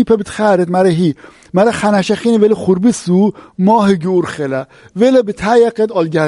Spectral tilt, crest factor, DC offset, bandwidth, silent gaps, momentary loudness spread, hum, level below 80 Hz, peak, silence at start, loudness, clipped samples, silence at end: -6.5 dB/octave; 12 dB; under 0.1%; 11.5 kHz; none; 7 LU; none; -48 dBFS; 0 dBFS; 0 s; -13 LUFS; under 0.1%; 0 s